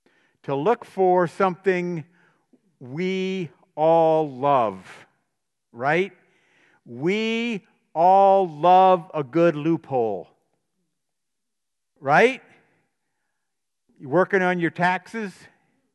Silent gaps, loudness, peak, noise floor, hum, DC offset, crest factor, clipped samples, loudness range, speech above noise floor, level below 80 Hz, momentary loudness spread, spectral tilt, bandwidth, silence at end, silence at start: none; -21 LUFS; -4 dBFS; -84 dBFS; none; under 0.1%; 20 dB; under 0.1%; 7 LU; 64 dB; -78 dBFS; 17 LU; -6.5 dB/octave; 11 kHz; 0.65 s; 0.5 s